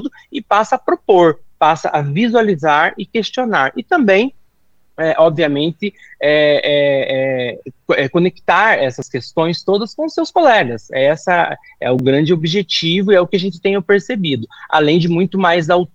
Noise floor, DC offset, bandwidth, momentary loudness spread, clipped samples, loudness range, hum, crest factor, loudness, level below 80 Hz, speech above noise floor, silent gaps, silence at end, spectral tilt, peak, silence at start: -57 dBFS; under 0.1%; 8 kHz; 8 LU; under 0.1%; 1 LU; none; 14 dB; -15 LUFS; -58 dBFS; 43 dB; none; 0.1 s; -6 dB/octave; 0 dBFS; 0 s